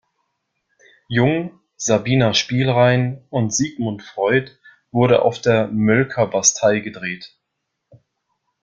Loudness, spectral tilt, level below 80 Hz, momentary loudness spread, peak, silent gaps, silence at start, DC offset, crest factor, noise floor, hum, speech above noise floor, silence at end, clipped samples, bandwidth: -18 LUFS; -4.5 dB/octave; -54 dBFS; 11 LU; -2 dBFS; none; 1.1 s; under 0.1%; 18 dB; -77 dBFS; none; 59 dB; 1.35 s; under 0.1%; 9.2 kHz